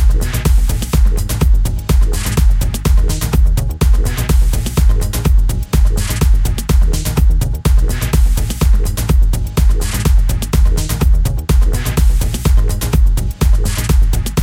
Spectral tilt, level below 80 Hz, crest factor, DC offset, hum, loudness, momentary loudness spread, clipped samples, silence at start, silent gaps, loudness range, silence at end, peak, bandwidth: -5.5 dB/octave; -12 dBFS; 12 dB; under 0.1%; none; -15 LUFS; 2 LU; under 0.1%; 0 s; none; 0 LU; 0 s; 0 dBFS; 16.5 kHz